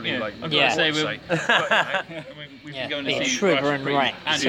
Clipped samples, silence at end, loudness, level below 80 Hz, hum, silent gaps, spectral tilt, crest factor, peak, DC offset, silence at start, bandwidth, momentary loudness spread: under 0.1%; 0 s; -22 LUFS; -60 dBFS; none; none; -3 dB/octave; 20 dB; -4 dBFS; under 0.1%; 0 s; 16.5 kHz; 17 LU